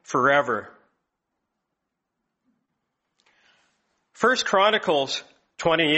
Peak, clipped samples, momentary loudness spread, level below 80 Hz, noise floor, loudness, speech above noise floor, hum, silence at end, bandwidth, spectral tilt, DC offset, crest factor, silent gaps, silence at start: -4 dBFS; under 0.1%; 9 LU; -66 dBFS; -81 dBFS; -22 LUFS; 60 dB; none; 0 s; 8.4 kHz; -3.5 dB/octave; under 0.1%; 22 dB; none; 0.1 s